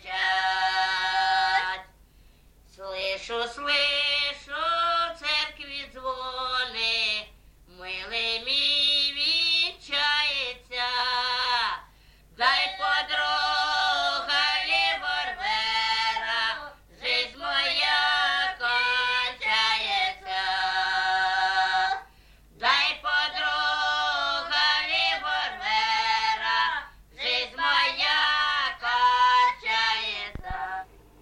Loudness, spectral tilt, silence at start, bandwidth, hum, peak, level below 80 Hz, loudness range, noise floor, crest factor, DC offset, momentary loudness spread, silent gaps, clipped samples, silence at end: -24 LUFS; -0.5 dB/octave; 0 s; 12 kHz; none; -8 dBFS; -54 dBFS; 4 LU; -55 dBFS; 18 dB; under 0.1%; 9 LU; none; under 0.1%; 0.35 s